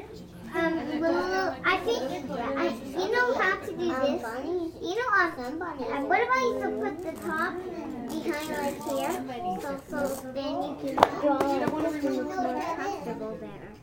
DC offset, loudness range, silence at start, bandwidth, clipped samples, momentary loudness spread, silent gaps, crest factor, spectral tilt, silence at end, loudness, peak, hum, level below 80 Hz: under 0.1%; 4 LU; 0 s; 17.5 kHz; under 0.1%; 10 LU; none; 28 dB; -4.5 dB/octave; 0 s; -29 LUFS; 0 dBFS; none; -56 dBFS